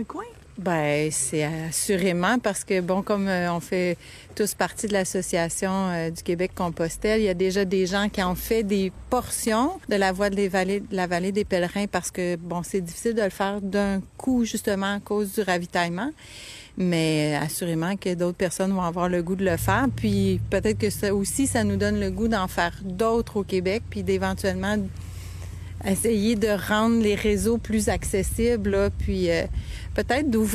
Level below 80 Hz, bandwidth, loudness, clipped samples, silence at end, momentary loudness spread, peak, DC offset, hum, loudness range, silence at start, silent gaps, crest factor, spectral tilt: -42 dBFS; 14 kHz; -25 LUFS; under 0.1%; 0 s; 6 LU; -6 dBFS; under 0.1%; none; 3 LU; 0 s; none; 18 dB; -5 dB/octave